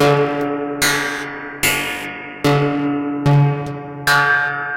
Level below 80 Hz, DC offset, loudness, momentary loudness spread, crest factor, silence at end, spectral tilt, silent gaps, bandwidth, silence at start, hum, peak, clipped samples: -48 dBFS; under 0.1%; -17 LUFS; 10 LU; 16 dB; 0 s; -4.5 dB/octave; none; 16.5 kHz; 0 s; none; -2 dBFS; under 0.1%